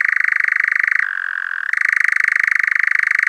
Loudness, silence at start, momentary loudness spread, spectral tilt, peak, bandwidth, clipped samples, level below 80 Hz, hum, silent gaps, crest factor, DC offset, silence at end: -15 LUFS; 0 s; 7 LU; 5 dB/octave; -2 dBFS; 13.5 kHz; under 0.1%; -78 dBFS; none; none; 14 dB; under 0.1%; 0 s